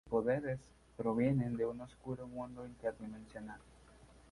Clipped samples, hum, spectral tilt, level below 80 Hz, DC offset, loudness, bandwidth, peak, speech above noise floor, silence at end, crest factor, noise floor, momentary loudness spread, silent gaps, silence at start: under 0.1%; none; -9 dB/octave; -64 dBFS; under 0.1%; -39 LUFS; 11.5 kHz; -20 dBFS; 23 dB; 0.2 s; 18 dB; -61 dBFS; 16 LU; none; 0.05 s